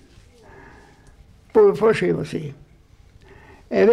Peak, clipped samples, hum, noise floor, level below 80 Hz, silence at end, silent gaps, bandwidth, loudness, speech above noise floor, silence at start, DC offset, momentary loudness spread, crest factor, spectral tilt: -6 dBFS; under 0.1%; none; -51 dBFS; -52 dBFS; 0 s; none; 10.5 kHz; -19 LUFS; 33 dB; 1.55 s; under 0.1%; 15 LU; 16 dB; -7 dB/octave